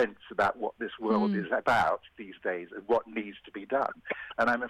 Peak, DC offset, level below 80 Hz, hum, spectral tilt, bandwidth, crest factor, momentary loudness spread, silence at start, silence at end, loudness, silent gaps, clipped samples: -14 dBFS; under 0.1%; -64 dBFS; none; -6 dB/octave; 14 kHz; 16 dB; 11 LU; 0 s; 0 s; -30 LUFS; none; under 0.1%